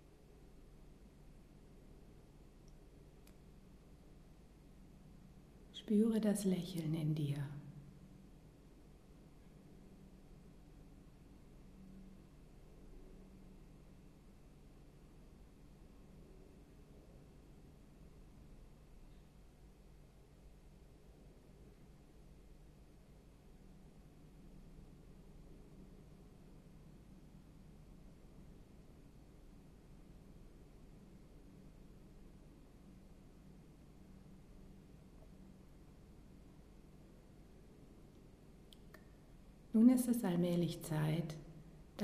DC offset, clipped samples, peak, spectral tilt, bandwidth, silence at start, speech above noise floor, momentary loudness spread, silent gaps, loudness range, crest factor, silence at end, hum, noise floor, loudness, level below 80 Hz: under 0.1%; under 0.1%; -18 dBFS; -7 dB/octave; 14 kHz; 0.4 s; 26 dB; 24 LU; none; 24 LU; 28 dB; 0 s; none; -62 dBFS; -37 LUFS; -62 dBFS